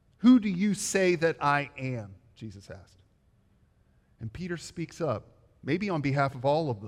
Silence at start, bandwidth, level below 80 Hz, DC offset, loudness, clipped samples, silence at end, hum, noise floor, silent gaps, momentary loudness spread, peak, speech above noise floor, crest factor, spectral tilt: 0.2 s; 14 kHz; -62 dBFS; under 0.1%; -28 LUFS; under 0.1%; 0 s; none; -65 dBFS; none; 23 LU; -10 dBFS; 37 dB; 18 dB; -5.5 dB/octave